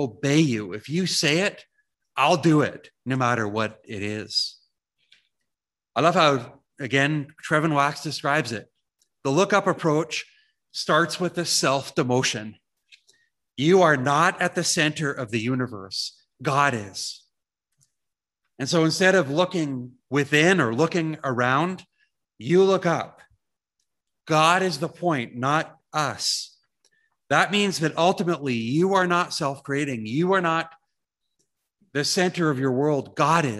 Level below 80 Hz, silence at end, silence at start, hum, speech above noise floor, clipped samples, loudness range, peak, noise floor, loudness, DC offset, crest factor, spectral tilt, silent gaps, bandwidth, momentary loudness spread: -68 dBFS; 0 s; 0 s; none; 64 dB; under 0.1%; 3 LU; -2 dBFS; -87 dBFS; -23 LUFS; under 0.1%; 22 dB; -4.5 dB/octave; none; 12.5 kHz; 12 LU